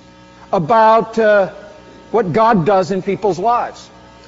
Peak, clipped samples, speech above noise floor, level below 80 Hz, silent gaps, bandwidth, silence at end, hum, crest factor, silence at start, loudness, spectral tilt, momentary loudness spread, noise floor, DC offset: -2 dBFS; under 0.1%; 28 dB; -50 dBFS; none; 7.8 kHz; 0.45 s; none; 12 dB; 0.5 s; -14 LUFS; -5 dB/octave; 9 LU; -41 dBFS; under 0.1%